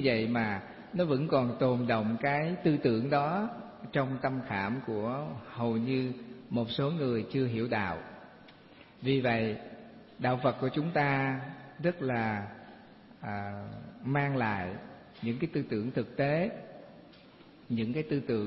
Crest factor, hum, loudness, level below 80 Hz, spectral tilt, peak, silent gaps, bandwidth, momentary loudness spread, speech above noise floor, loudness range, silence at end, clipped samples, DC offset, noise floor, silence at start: 18 dB; none; -32 LUFS; -64 dBFS; -10.5 dB/octave; -14 dBFS; none; 5.8 kHz; 16 LU; 25 dB; 5 LU; 0 s; under 0.1%; under 0.1%; -55 dBFS; 0 s